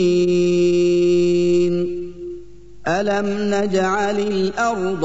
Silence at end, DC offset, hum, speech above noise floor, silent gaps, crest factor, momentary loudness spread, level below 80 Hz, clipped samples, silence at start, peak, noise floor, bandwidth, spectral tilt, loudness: 0 s; 2%; 50 Hz at -50 dBFS; 22 dB; none; 10 dB; 13 LU; -48 dBFS; under 0.1%; 0 s; -6 dBFS; -40 dBFS; 8 kHz; -6 dB/octave; -18 LUFS